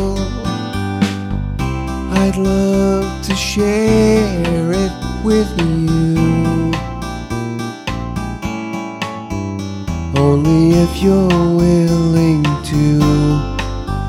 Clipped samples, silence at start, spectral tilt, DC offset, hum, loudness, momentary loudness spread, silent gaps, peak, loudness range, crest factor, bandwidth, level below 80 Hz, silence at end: under 0.1%; 0 s; -6.5 dB/octave; under 0.1%; none; -16 LUFS; 11 LU; none; 0 dBFS; 7 LU; 14 dB; 14.5 kHz; -28 dBFS; 0 s